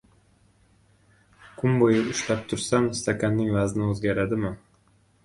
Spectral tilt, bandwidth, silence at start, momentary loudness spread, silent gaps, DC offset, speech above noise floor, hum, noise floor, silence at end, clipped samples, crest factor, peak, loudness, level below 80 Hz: -5.5 dB/octave; 11.5 kHz; 1.45 s; 7 LU; none; under 0.1%; 38 dB; none; -62 dBFS; 0.65 s; under 0.1%; 20 dB; -6 dBFS; -25 LUFS; -52 dBFS